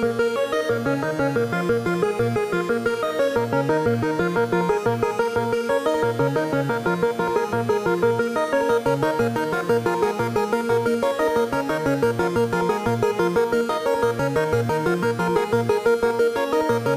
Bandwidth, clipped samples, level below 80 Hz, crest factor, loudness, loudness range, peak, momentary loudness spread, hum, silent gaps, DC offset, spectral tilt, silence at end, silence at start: 15.5 kHz; under 0.1%; -50 dBFS; 14 dB; -22 LUFS; 1 LU; -8 dBFS; 2 LU; none; none; under 0.1%; -6 dB/octave; 0 s; 0 s